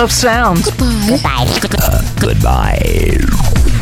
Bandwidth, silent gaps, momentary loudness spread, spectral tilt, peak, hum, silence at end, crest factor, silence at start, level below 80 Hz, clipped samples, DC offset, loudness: over 20 kHz; none; 3 LU; -5 dB/octave; -2 dBFS; none; 0 s; 10 dB; 0 s; -16 dBFS; under 0.1%; under 0.1%; -13 LUFS